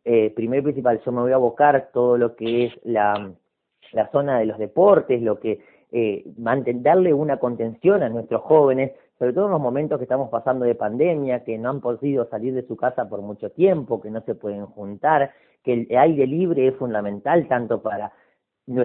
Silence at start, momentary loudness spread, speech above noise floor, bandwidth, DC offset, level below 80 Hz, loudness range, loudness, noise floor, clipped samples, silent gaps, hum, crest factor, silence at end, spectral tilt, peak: 0.05 s; 11 LU; 23 dB; 4.2 kHz; under 0.1%; -64 dBFS; 4 LU; -21 LUFS; -44 dBFS; under 0.1%; none; none; 18 dB; 0 s; -12 dB/octave; -2 dBFS